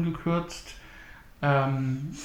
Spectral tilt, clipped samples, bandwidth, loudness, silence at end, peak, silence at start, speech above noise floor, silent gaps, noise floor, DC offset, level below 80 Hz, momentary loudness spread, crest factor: -6.5 dB/octave; under 0.1%; 12.5 kHz; -28 LUFS; 0 s; -12 dBFS; 0 s; 21 dB; none; -48 dBFS; under 0.1%; -50 dBFS; 22 LU; 16 dB